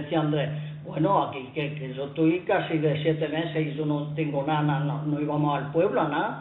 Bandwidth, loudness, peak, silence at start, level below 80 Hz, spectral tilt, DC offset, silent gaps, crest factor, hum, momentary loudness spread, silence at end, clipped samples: 4.1 kHz; -26 LUFS; -10 dBFS; 0 s; -64 dBFS; -11.5 dB/octave; under 0.1%; none; 14 dB; none; 8 LU; 0 s; under 0.1%